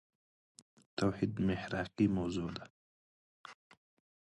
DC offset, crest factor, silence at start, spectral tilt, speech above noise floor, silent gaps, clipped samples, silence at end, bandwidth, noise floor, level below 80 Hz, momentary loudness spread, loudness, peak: under 0.1%; 20 dB; 0.95 s; -7 dB/octave; over 55 dB; 2.70-3.44 s; under 0.1%; 0.7 s; 11 kHz; under -90 dBFS; -60 dBFS; 23 LU; -36 LUFS; -18 dBFS